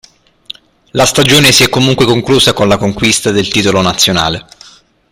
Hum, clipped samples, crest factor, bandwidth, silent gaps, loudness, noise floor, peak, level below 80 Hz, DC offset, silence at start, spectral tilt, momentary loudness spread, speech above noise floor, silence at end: none; 0.2%; 10 dB; over 20 kHz; none; -9 LUFS; -40 dBFS; 0 dBFS; -36 dBFS; under 0.1%; 0.95 s; -3.5 dB/octave; 16 LU; 31 dB; 0.7 s